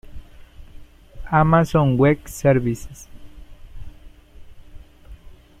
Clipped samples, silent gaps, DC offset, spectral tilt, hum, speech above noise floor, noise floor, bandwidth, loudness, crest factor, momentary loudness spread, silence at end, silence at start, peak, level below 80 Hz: under 0.1%; none; under 0.1%; -7.5 dB/octave; none; 26 dB; -43 dBFS; 15 kHz; -18 LUFS; 18 dB; 16 LU; 0.3 s; 0.1 s; -4 dBFS; -40 dBFS